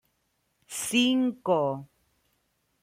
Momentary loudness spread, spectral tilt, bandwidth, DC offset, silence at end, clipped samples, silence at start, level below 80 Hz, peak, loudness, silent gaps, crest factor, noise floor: 13 LU; -3.5 dB/octave; 16 kHz; under 0.1%; 1 s; under 0.1%; 0.7 s; -72 dBFS; -12 dBFS; -26 LUFS; none; 18 dB; -75 dBFS